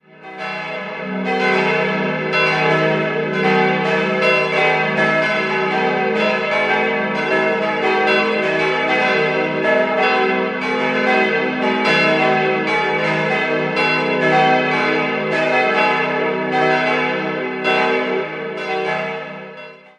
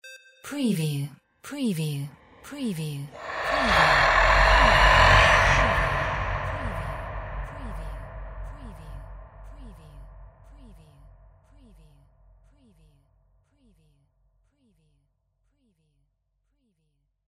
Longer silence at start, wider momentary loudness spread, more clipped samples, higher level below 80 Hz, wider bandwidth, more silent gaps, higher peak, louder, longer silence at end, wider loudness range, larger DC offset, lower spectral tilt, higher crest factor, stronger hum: first, 0.2 s vs 0.05 s; second, 8 LU vs 25 LU; neither; second, -62 dBFS vs -34 dBFS; second, 10 kHz vs 16 kHz; neither; about the same, -2 dBFS vs -2 dBFS; first, -17 LUFS vs -22 LUFS; second, 0.2 s vs 6.65 s; second, 2 LU vs 22 LU; neither; about the same, -5.5 dB/octave vs -4.5 dB/octave; second, 16 dB vs 24 dB; neither